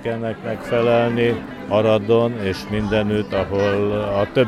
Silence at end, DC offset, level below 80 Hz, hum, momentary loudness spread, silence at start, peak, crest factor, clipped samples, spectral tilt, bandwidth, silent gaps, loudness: 0 s; under 0.1%; -44 dBFS; none; 8 LU; 0 s; -4 dBFS; 16 dB; under 0.1%; -7 dB/octave; 13 kHz; none; -20 LUFS